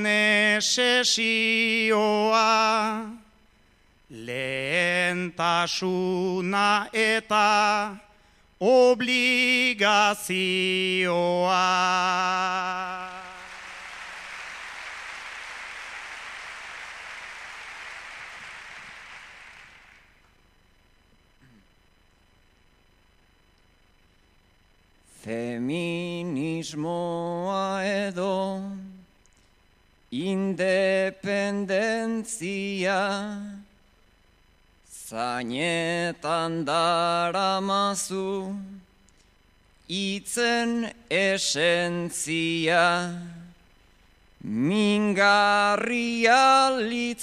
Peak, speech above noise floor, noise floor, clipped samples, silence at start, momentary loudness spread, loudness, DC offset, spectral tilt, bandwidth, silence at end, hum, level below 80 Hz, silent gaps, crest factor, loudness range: -6 dBFS; 37 dB; -61 dBFS; under 0.1%; 0 s; 18 LU; -23 LUFS; under 0.1%; -3.5 dB/octave; 15.5 kHz; 0 s; none; -62 dBFS; none; 20 dB; 16 LU